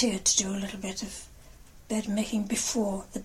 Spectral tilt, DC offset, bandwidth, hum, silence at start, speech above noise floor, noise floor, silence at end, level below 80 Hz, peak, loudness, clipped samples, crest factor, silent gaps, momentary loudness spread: -3 dB/octave; under 0.1%; 16 kHz; none; 0 s; 21 dB; -50 dBFS; 0 s; -52 dBFS; -10 dBFS; -28 LUFS; under 0.1%; 20 dB; none; 12 LU